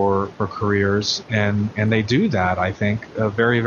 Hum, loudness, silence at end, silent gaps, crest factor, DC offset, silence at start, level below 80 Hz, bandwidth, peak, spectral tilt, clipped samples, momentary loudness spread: none; -20 LUFS; 0 s; none; 16 dB; under 0.1%; 0 s; -50 dBFS; 7.2 kHz; -4 dBFS; -6 dB/octave; under 0.1%; 5 LU